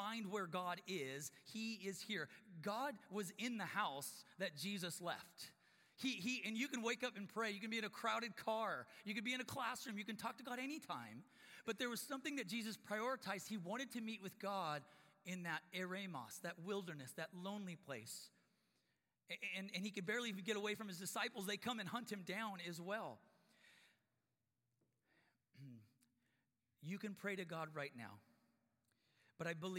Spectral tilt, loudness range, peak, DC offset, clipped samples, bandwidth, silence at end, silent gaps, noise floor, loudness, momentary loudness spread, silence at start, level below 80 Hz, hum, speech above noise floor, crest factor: -3.5 dB/octave; 7 LU; -26 dBFS; under 0.1%; under 0.1%; 16.5 kHz; 0 s; none; under -90 dBFS; -46 LUFS; 9 LU; 0 s; under -90 dBFS; none; over 43 dB; 22 dB